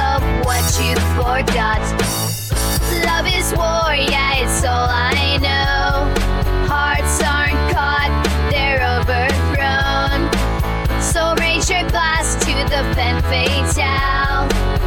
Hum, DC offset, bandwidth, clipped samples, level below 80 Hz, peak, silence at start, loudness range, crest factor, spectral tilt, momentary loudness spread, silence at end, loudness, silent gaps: none; under 0.1%; 19 kHz; under 0.1%; -22 dBFS; -4 dBFS; 0 s; 1 LU; 12 dB; -4 dB/octave; 3 LU; 0 s; -16 LUFS; none